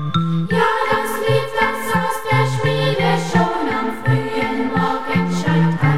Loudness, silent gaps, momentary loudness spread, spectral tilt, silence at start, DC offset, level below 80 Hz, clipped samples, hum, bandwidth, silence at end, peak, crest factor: -18 LUFS; none; 3 LU; -6 dB/octave; 0 s; 3%; -46 dBFS; under 0.1%; none; 16 kHz; 0 s; -2 dBFS; 16 dB